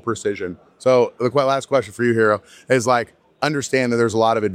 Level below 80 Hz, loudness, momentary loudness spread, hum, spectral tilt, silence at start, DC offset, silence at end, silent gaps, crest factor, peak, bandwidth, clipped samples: -62 dBFS; -19 LUFS; 7 LU; none; -5 dB/octave; 0.05 s; under 0.1%; 0 s; none; 18 dB; -2 dBFS; 14.5 kHz; under 0.1%